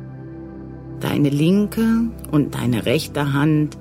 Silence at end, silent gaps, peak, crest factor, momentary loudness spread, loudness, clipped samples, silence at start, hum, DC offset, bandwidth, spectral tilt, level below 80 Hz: 0 s; none; -4 dBFS; 14 dB; 18 LU; -19 LUFS; under 0.1%; 0 s; none; under 0.1%; 16 kHz; -7 dB/octave; -42 dBFS